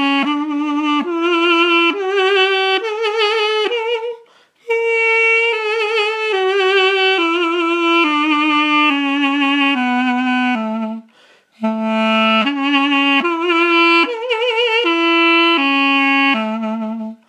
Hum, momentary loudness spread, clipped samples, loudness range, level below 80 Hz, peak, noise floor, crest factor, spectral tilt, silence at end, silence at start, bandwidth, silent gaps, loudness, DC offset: none; 8 LU; under 0.1%; 4 LU; -82 dBFS; -2 dBFS; -51 dBFS; 14 dB; -4 dB/octave; 0.15 s; 0 s; 10.5 kHz; none; -14 LUFS; under 0.1%